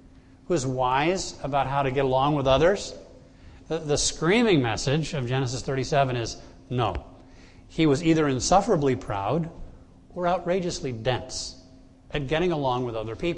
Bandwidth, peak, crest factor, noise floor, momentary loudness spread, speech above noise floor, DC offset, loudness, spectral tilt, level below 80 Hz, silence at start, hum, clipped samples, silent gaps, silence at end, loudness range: 10.5 kHz; -6 dBFS; 18 dB; -51 dBFS; 12 LU; 26 dB; under 0.1%; -25 LUFS; -5 dB/octave; -44 dBFS; 0.5 s; none; under 0.1%; none; 0 s; 4 LU